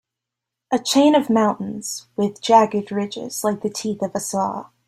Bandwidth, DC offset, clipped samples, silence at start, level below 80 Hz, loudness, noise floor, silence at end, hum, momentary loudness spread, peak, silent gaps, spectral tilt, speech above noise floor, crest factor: 16 kHz; under 0.1%; under 0.1%; 0.7 s; -64 dBFS; -20 LUFS; -84 dBFS; 0.25 s; none; 12 LU; -2 dBFS; none; -4.5 dB/octave; 65 dB; 18 dB